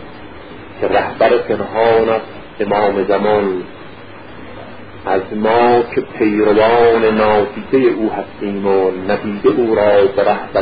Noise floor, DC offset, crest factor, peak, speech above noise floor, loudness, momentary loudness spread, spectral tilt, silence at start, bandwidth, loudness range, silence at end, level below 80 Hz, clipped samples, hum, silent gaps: -34 dBFS; 1%; 14 dB; 0 dBFS; 21 dB; -14 LUFS; 22 LU; -11.5 dB/octave; 0 s; 5 kHz; 4 LU; 0 s; -44 dBFS; under 0.1%; none; none